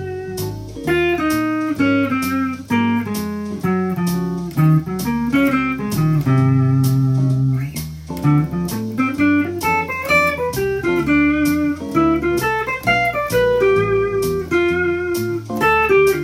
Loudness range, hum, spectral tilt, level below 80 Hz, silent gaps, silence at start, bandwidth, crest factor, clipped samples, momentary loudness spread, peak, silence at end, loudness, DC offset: 2 LU; none; -6.5 dB/octave; -42 dBFS; none; 0 s; 16.5 kHz; 14 dB; under 0.1%; 8 LU; -2 dBFS; 0 s; -18 LUFS; under 0.1%